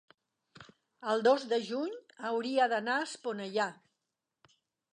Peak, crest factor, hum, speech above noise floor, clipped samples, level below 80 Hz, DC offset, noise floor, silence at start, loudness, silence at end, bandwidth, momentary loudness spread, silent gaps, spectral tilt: -16 dBFS; 20 dB; none; 56 dB; under 0.1%; -86 dBFS; under 0.1%; -87 dBFS; 0.6 s; -32 LUFS; 1.2 s; 11 kHz; 11 LU; none; -4 dB/octave